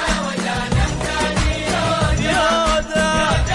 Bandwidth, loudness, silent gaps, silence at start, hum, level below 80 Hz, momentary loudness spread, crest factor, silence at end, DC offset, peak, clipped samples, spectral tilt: 11.5 kHz; -18 LUFS; none; 0 s; none; -26 dBFS; 4 LU; 12 dB; 0 s; under 0.1%; -6 dBFS; under 0.1%; -4.5 dB/octave